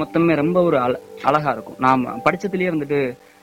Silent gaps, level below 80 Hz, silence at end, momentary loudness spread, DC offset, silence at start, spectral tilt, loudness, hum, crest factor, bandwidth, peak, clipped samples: none; -54 dBFS; 0.3 s; 6 LU; under 0.1%; 0 s; -7.5 dB/octave; -19 LUFS; none; 16 dB; 16.5 kHz; -4 dBFS; under 0.1%